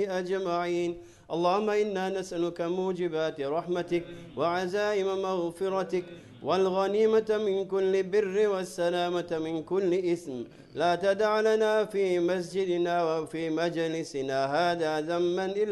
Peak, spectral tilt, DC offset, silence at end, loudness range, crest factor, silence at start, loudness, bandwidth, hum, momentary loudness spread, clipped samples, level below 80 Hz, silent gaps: -12 dBFS; -5.5 dB/octave; under 0.1%; 0 s; 3 LU; 16 dB; 0 s; -28 LUFS; 12 kHz; none; 7 LU; under 0.1%; -66 dBFS; none